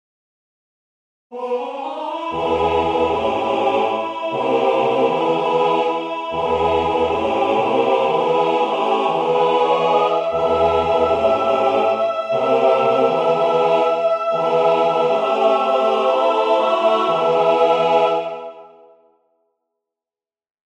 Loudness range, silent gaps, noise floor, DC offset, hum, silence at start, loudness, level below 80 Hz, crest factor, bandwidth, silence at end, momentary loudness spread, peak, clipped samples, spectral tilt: 4 LU; none; under -90 dBFS; under 0.1%; none; 1.3 s; -17 LUFS; -50 dBFS; 14 dB; 9.6 kHz; 2.1 s; 7 LU; -4 dBFS; under 0.1%; -5.5 dB/octave